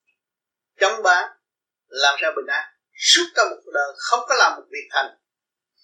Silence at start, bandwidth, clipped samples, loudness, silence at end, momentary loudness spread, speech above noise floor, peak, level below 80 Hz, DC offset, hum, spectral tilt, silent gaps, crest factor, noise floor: 0.8 s; 16 kHz; under 0.1%; -19 LUFS; 0.75 s; 15 LU; 67 dB; -2 dBFS; -82 dBFS; under 0.1%; none; 2.5 dB/octave; none; 20 dB; -87 dBFS